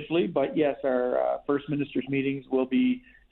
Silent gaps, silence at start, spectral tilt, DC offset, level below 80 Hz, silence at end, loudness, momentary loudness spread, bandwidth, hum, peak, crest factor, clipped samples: none; 0 s; -10.5 dB/octave; under 0.1%; -62 dBFS; 0.35 s; -27 LUFS; 4 LU; 4.1 kHz; none; -12 dBFS; 14 dB; under 0.1%